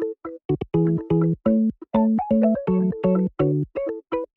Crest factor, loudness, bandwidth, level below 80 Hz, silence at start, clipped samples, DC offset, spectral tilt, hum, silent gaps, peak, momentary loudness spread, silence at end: 16 dB; -22 LUFS; 3.9 kHz; -50 dBFS; 0 s; under 0.1%; under 0.1%; -12 dB/octave; none; 0.45-0.49 s; -6 dBFS; 8 LU; 0.1 s